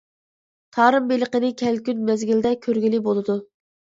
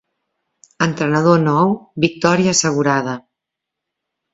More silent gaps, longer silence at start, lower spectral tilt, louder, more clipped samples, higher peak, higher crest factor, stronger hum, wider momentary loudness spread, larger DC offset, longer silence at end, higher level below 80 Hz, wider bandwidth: neither; about the same, 0.75 s vs 0.8 s; first, -6 dB/octave vs -4.5 dB/octave; second, -21 LUFS vs -16 LUFS; neither; about the same, -2 dBFS vs 0 dBFS; about the same, 20 dB vs 18 dB; neither; about the same, 7 LU vs 7 LU; neither; second, 0.35 s vs 1.15 s; second, -64 dBFS vs -56 dBFS; about the same, 7.8 kHz vs 8 kHz